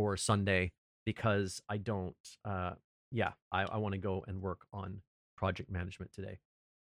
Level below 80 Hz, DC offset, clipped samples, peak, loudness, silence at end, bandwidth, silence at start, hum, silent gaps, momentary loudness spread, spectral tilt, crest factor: -60 dBFS; under 0.1%; under 0.1%; -18 dBFS; -37 LUFS; 0.45 s; 14 kHz; 0 s; none; 0.78-1.06 s, 2.20-2.24 s, 2.84-3.11 s, 3.42-3.51 s, 5.07-5.37 s; 15 LU; -5.5 dB/octave; 20 dB